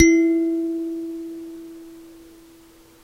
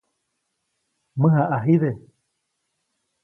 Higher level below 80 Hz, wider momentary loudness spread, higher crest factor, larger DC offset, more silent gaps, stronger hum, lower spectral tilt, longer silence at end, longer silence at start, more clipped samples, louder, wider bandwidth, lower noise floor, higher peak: first, -52 dBFS vs -64 dBFS; first, 25 LU vs 16 LU; about the same, 22 dB vs 18 dB; neither; neither; neither; second, -4.5 dB/octave vs -12 dB/octave; second, 0.85 s vs 1.25 s; second, 0 s vs 1.15 s; neither; about the same, -22 LUFS vs -20 LUFS; first, 6.8 kHz vs 3.1 kHz; second, -50 dBFS vs -76 dBFS; first, 0 dBFS vs -6 dBFS